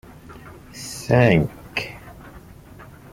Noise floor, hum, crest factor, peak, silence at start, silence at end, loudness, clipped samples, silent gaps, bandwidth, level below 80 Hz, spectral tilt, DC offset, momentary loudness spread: -43 dBFS; none; 22 dB; -2 dBFS; 0.3 s; 0.3 s; -20 LUFS; under 0.1%; none; 16 kHz; -46 dBFS; -6 dB/octave; under 0.1%; 27 LU